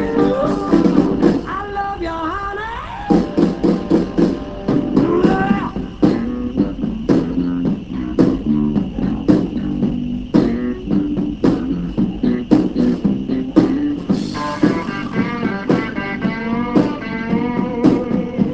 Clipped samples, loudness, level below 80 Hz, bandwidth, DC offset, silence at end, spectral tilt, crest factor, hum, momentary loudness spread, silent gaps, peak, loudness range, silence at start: under 0.1%; -18 LUFS; -36 dBFS; 8 kHz; 0.4%; 0 s; -8 dB/octave; 16 dB; none; 7 LU; none; 0 dBFS; 2 LU; 0 s